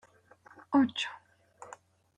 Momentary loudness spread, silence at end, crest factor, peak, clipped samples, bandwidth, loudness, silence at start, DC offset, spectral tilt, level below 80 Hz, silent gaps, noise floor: 26 LU; 0.45 s; 22 dB; -14 dBFS; under 0.1%; 9 kHz; -30 LUFS; 0.7 s; under 0.1%; -4 dB/octave; -76 dBFS; none; -60 dBFS